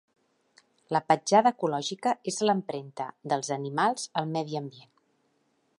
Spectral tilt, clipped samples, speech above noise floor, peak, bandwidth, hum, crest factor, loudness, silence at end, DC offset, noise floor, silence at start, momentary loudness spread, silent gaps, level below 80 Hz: -4.5 dB/octave; under 0.1%; 44 dB; -8 dBFS; 11.5 kHz; none; 22 dB; -28 LUFS; 1 s; under 0.1%; -72 dBFS; 0.9 s; 14 LU; none; -80 dBFS